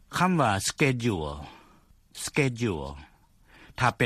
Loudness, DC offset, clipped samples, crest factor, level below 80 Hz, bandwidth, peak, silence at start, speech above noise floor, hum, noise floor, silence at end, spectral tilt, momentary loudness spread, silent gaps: -27 LUFS; under 0.1%; under 0.1%; 22 dB; -50 dBFS; 15 kHz; -8 dBFS; 0.1 s; 32 dB; none; -58 dBFS; 0 s; -5 dB/octave; 22 LU; none